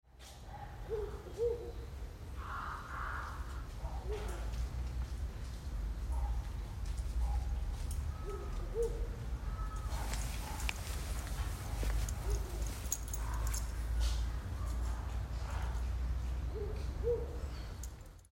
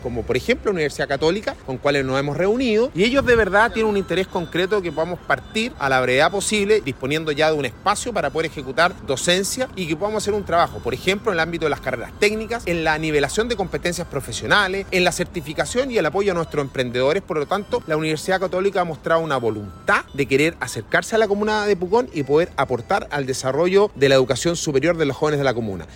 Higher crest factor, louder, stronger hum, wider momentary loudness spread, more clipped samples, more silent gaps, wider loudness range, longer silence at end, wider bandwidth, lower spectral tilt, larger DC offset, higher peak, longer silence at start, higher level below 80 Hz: first, 22 dB vs 16 dB; second, -41 LUFS vs -20 LUFS; neither; about the same, 8 LU vs 7 LU; neither; neither; about the same, 3 LU vs 2 LU; about the same, 0.05 s vs 0 s; about the same, 16 kHz vs 16.5 kHz; about the same, -5 dB/octave vs -4.5 dB/octave; neither; second, -16 dBFS vs -4 dBFS; about the same, 0.05 s vs 0 s; about the same, -40 dBFS vs -42 dBFS